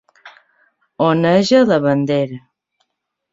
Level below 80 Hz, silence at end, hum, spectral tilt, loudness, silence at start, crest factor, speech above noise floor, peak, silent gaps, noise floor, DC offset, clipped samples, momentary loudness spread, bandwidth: -58 dBFS; 0.95 s; none; -6.5 dB/octave; -15 LUFS; 0.25 s; 16 dB; 61 dB; -2 dBFS; none; -75 dBFS; under 0.1%; under 0.1%; 10 LU; 7.8 kHz